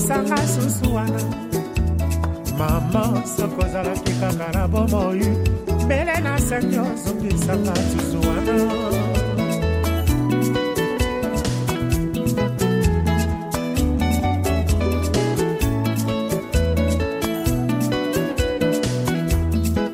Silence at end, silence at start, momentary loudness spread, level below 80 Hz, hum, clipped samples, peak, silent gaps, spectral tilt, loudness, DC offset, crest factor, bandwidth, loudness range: 0 s; 0 s; 3 LU; -28 dBFS; none; under 0.1%; -6 dBFS; none; -6 dB/octave; -21 LUFS; under 0.1%; 14 dB; 16 kHz; 1 LU